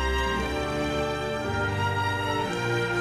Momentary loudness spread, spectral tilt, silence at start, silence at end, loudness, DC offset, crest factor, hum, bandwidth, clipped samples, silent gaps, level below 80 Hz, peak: 2 LU; -5 dB/octave; 0 s; 0 s; -27 LUFS; under 0.1%; 12 dB; none; 14 kHz; under 0.1%; none; -38 dBFS; -14 dBFS